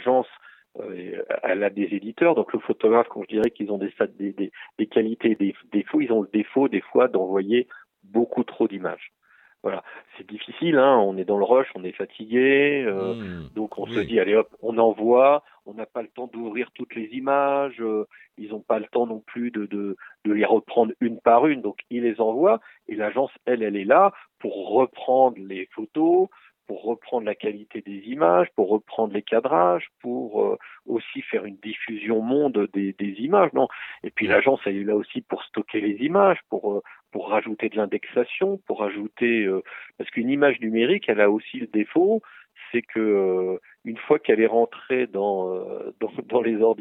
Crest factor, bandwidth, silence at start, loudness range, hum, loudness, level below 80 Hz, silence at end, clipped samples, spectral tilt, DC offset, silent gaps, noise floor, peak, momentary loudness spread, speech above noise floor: 20 dB; 4.1 kHz; 0 s; 4 LU; none; -23 LUFS; -70 dBFS; 0.05 s; under 0.1%; -8.5 dB/octave; under 0.1%; none; -50 dBFS; -4 dBFS; 14 LU; 28 dB